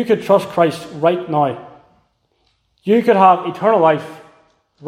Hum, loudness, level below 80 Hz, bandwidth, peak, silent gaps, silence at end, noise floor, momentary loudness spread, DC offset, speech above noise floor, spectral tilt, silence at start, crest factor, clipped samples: none; -15 LUFS; -64 dBFS; 15.5 kHz; 0 dBFS; none; 0 s; -63 dBFS; 10 LU; under 0.1%; 49 dB; -7 dB/octave; 0 s; 16 dB; under 0.1%